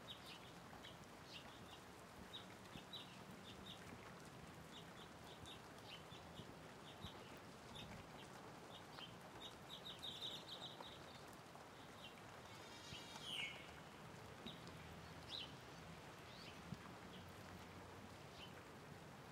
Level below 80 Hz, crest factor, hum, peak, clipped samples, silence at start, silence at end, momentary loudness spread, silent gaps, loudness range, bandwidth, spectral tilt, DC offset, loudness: -76 dBFS; 20 dB; none; -36 dBFS; under 0.1%; 0 s; 0 s; 7 LU; none; 4 LU; 16 kHz; -3.5 dB/octave; under 0.1%; -56 LUFS